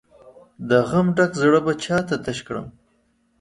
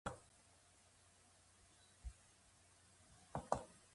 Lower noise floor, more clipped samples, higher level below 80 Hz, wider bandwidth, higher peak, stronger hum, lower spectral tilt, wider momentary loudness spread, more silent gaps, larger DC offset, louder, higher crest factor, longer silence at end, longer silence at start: second, -64 dBFS vs -70 dBFS; neither; first, -54 dBFS vs -64 dBFS; about the same, 11.5 kHz vs 11.5 kHz; first, -4 dBFS vs -20 dBFS; neither; about the same, -6 dB/octave vs -5 dB/octave; second, 15 LU vs 23 LU; neither; neither; first, -20 LUFS vs -50 LUFS; second, 18 dB vs 34 dB; first, 0.7 s vs 0.05 s; first, 0.25 s vs 0.05 s